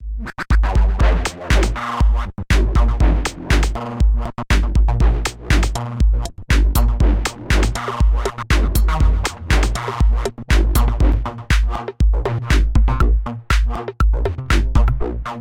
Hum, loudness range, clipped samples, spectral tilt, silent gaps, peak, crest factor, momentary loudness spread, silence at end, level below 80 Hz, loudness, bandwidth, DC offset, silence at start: none; 1 LU; under 0.1%; -5.5 dB/octave; none; -2 dBFS; 14 dB; 6 LU; 0 s; -16 dBFS; -19 LUFS; 16 kHz; under 0.1%; 0 s